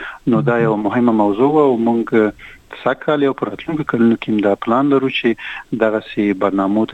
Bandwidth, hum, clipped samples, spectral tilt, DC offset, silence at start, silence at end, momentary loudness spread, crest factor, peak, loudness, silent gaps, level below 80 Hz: 8.2 kHz; none; under 0.1%; -8 dB/octave; under 0.1%; 0 s; 0 s; 8 LU; 14 dB; -2 dBFS; -16 LUFS; none; -52 dBFS